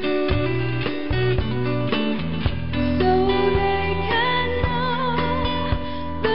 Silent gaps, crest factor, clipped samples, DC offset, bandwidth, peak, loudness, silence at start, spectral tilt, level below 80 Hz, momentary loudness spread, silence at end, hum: none; 16 dB; under 0.1%; 3%; 5.6 kHz; -6 dBFS; -22 LUFS; 0 s; -4.5 dB/octave; -32 dBFS; 6 LU; 0 s; none